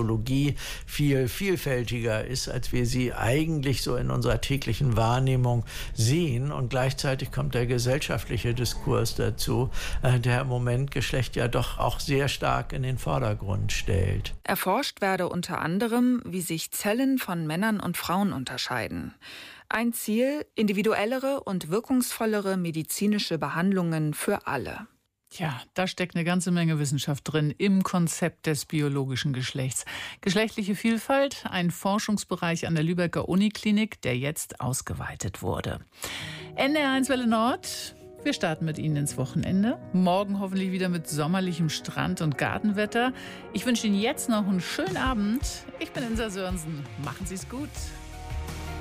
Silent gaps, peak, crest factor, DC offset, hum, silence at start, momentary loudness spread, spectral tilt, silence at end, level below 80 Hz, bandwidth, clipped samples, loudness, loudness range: none; -10 dBFS; 16 dB; under 0.1%; none; 0 s; 9 LU; -5.5 dB/octave; 0 s; -42 dBFS; 15.5 kHz; under 0.1%; -27 LUFS; 2 LU